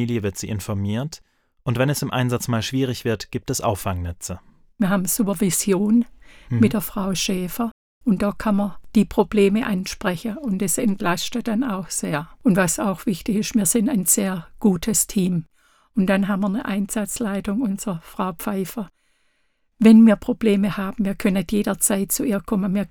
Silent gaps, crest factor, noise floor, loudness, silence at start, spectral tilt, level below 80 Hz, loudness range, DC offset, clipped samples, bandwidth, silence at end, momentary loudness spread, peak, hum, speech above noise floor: 7.71-8.01 s; 20 dB; -66 dBFS; -21 LUFS; 0 s; -5 dB/octave; -46 dBFS; 5 LU; under 0.1%; under 0.1%; 19 kHz; 0.05 s; 10 LU; -2 dBFS; none; 45 dB